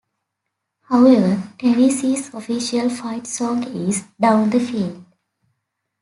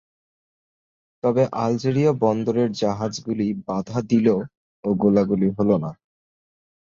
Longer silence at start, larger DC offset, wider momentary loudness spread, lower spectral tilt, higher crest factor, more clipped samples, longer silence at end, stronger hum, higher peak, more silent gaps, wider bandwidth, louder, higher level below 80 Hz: second, 0.9 s vs 1.25 s; neither; first, 12 LU vs 7 LU; second, -5.5 dB/octave vs -7.5 dB/octave; about the same, 18 dB vs 16 dB; neither; about the same, 1 s vs 1 s; neither; first, -2 dBFS vs -6 dBFS; second, none vs 4.57-4.83 s; first, 11.5 kHz vs 7.6 kHz; first, -18 LUFS vs -22 LUFS; second, -64 dBFS vs -56 dBFS